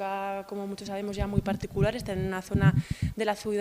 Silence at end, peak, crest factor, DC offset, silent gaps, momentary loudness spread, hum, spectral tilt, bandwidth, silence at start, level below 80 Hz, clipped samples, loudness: 0 s; -10 dBFS; 20 dB; under 0.1%; none; 10 LU; none; -7 dB/octave; 15.5 kHz; 0 s; -42 dBFS; under 0.1%; -30 LUFS